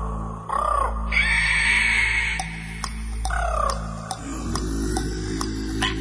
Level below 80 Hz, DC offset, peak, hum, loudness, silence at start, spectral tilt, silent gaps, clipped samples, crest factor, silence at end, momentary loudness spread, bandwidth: -30 dBFS; under 0.1%; -6 dBFS; none; -23 LUFS; 0 s; -3.5 dB/octave; none; under 0.1%; 18 dB; 0 s; 14 LU; 11 kHz